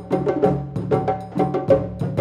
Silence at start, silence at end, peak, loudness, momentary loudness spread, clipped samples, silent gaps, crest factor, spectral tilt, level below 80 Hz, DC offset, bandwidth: 0 s; 0 s; -4 dBFS; -21 LUFS; 6 LU; under 0.1%; none; 18 dB; -9.5 dB/octave; -44 dBFS; under 0.1%; 9.8 kHz